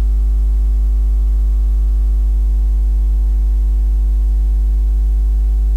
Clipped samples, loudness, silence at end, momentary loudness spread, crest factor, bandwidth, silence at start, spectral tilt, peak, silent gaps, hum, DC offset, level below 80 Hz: under 0.1%; -17 LUFS; 0 s; 0 LU; 4 dB; 1.2 kHz; 0 s; -8.5 dB/octave; -8 dBFS; none; none; under 0.1%; -12 dBFS